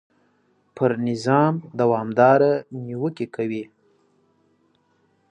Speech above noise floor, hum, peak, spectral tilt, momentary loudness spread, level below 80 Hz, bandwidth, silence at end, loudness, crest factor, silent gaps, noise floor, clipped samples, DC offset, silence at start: 44 dB; none; -2 dBFS; -7.5 dB/octave; 12 LU; -70 dBFS; 10 kHz; 1.65 s; -21 LUFS; 20 dB; none; -64 dBFS; under 0.1%; under 0.1%; 0.75 s